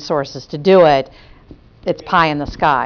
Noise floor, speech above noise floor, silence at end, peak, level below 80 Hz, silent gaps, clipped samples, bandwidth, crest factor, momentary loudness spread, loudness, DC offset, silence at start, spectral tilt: -42 dBFS; 28 dB; 0 s; -2 dBFS; -42 dBFS; none; under 0.1%; 5.4 kHz; 14 dB; 16 LU; -15 LUFS; under 0.1%; 0 s; -6.5 dB/octave